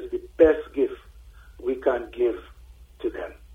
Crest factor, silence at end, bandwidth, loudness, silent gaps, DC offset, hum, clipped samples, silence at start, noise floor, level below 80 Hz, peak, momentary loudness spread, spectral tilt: 22 dB; 0 s; 6.6 kHz; -25 LUFS; none; under 0.1%; 60 Hz at -50 dBFS; under 0.1%; 0 s; -48 dBFS; -46 dBFS; -4 dBFS; 16 LU; -7.5 dB/octave